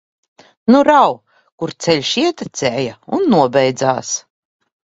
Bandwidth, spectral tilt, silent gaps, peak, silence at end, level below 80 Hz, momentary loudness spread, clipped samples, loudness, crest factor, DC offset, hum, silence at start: 8 kHz; -4.5 dB/octave; 1.52-1.58 s; 0 dBFS; 0.65 s; -58 dBFS; 12 LU; under 0.1%; -15 LUFS; 16 dB; under 0.1%; none; 0.65 s